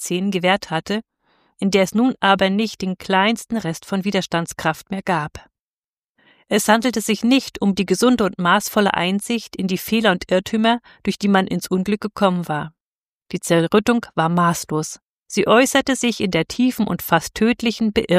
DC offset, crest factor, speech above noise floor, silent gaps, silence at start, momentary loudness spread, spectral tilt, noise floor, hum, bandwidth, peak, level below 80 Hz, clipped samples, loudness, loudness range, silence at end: under 0.1%; 18 dB; over 71 dB; 5.59-6.15 s, 12.80-13.26 s, 15.06-15.20 s; 0 s; 9 LU; -4.5 dB/octave; under -90 dBFS; none; 15.5 kHz; -2 dBFS; -52 dBFS; under 0.1%; -19 LUFS; 4 LU; 0 s